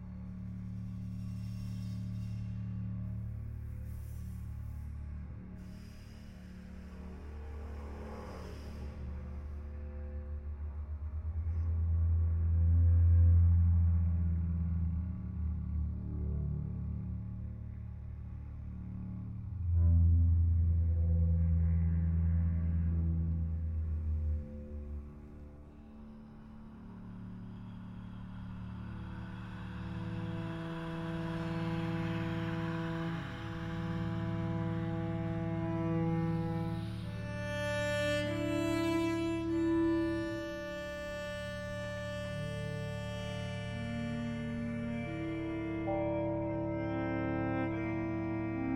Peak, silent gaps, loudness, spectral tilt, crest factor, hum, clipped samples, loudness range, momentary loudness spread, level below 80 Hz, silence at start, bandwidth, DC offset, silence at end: -18 dBFS; none; -36 LUFS; -8 dB/octave; 16 dB; none; under 0.1%; 16 LU; 16 LU; -40 dBFS; 0 s; 8.8 kHz; under 0.1%; 0 s